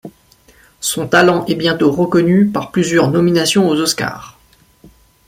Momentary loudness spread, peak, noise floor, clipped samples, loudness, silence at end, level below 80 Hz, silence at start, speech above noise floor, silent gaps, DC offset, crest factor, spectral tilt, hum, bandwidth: 8 LU; 0 dBFS; -51 dBFS; under 0.1%; -14 LUFS; 0.95 s; -50 dBFS; 0.05 s; 37 dB; none; under 0.1%; 14 dB; -4.5 dB/octave; none; 16.5 kHz